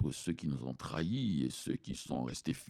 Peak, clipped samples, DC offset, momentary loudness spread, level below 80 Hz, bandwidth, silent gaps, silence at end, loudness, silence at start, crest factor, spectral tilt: -22 dBFS; under 0.1%; under 0.1%; 6 LU; -58 dBFS; 15.5 kHz; none; 0 s; -38 LUFS; 0 s; 16 dB; -5.5 dB/octave